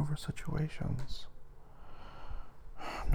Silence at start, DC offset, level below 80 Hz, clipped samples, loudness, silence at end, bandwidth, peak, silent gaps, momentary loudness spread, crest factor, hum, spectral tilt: 0 s; under 0.1%; -46 dBFS; under 0.1%; -41 LUFS; 0 s; 15 kHz; -20 dBFS; none; 20 LU; 18 dB; none; -6.5 dB/octave